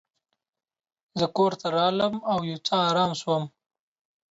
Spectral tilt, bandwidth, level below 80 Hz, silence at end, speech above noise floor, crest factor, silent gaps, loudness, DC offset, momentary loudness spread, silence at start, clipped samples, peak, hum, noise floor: -5.5 dB/octave; 8 kHz; -68 dBFS; 0.85 s; 55 dB; 16 dB; none; -25 LUFS; under 0.1%; 6 LU; 1.15 s; under 0.1%; -10 dBFS; none; -80 dBFS